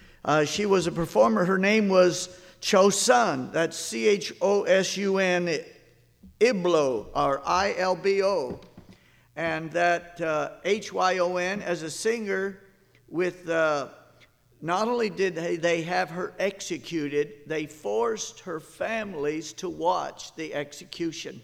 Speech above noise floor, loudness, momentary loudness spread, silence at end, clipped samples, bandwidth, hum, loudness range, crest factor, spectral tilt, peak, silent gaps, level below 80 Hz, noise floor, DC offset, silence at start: 33 dB; -26 LUFS; 12 LU; 0 s; under 0.1%; 16 kHz; none; 8 LU; 20 dB; -4 dB/octave; -6 dBFS; none; -60 dBFS; -59 dBFS; under 0.1%; 0.25 s